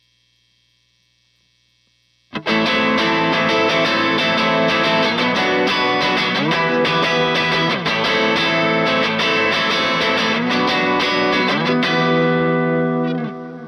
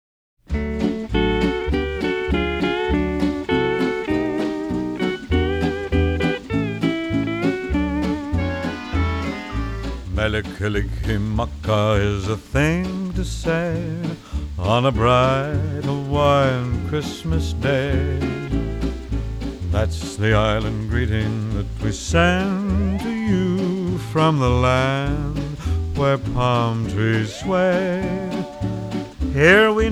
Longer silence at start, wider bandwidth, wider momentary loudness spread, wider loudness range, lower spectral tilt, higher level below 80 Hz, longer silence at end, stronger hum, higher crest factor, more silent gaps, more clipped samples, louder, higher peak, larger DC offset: first, 2.35 s vs 0.5 s; about the same, 13.5 kHz vs 13 kHz; second, 2 LU vs 9 LU; about the same, 3 LU vs 4 LU; second, -5 dB/octave vs -6.5 dB/octave; second, -54 dBFS vs -30 dBFS; about the same, 0 s vs 0 s; first, 60 Hz at -55 dBFS vs none; second, 12 dB vs 18 dB; neither; neither; first, -16 LUFS vs -21 LUFS; second, -6 dBFS vs -2 dBFS; neither